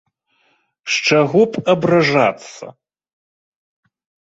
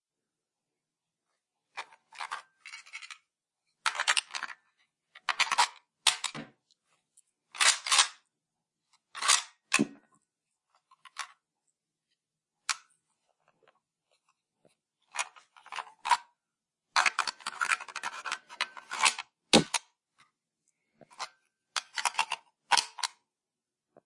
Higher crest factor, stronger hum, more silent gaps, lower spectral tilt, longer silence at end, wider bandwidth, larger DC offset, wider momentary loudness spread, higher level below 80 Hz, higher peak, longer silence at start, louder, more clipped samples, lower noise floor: second, 18 dB vs 28 dB; neither; neither; first, -5 dB/octave vs -0.5 dB/octave; first, 1.55 s vs 1 s; second, 8 kHz vs 11.5 kHz; neither; about the same, 19 LU vs 20 LU; first, -60 dBFS vs -78 dBFS; first, -2 dBFS vs -6 dBFS; second, 0.85 s vs 1.75 s; first, -15 LUFS vs -29 LUFS; neither; second, -62 dBFS vs under -90 dBFS